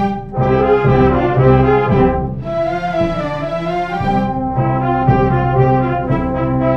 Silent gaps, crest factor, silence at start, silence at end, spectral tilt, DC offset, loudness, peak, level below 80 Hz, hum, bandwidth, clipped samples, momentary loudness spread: none; 14 dB; 0 s; 0 s; -9.5 dB/octave; under 0.1%; -15 LUFS; 0 dBFS; -28 dBFS; none; 6.2 kHz; under 0.1%; 8 LU